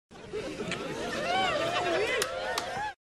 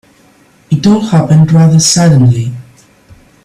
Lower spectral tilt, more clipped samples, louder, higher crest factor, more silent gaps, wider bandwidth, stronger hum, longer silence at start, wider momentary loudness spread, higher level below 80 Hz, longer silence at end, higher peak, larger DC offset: second, -3 dB/octave vs -5.5 dB/octave; neither; second, -31 LUFS vs -8 LUFS; first, 20 dB vs 10 dB; neither; about the same, 13 kHz vs 12.5 kHz; neither; second, 0.1 s vs 0.7 s; about the same, 9 LU vs 10 LU; second, -58 dBFS vs -42 dBFS; second, 0.25 s vs 0.8 s; second, -12 dBFS vs 0 dBFS; neither